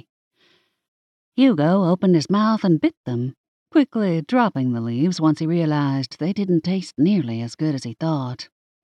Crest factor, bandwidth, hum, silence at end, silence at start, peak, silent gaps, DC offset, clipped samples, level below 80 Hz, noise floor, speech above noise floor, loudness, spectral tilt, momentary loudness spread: 14 dB; 9.8 kHz; none; 0.4 s; 1.35 s; -6 dBFS; 2.97-3.04 s, 3.37-3.66 s; under 0.1%; under 0.1%; -70 dBFS; -62 dBFS; 42 dB; -21 LUFS; -7.5 dB/octave; 9 LU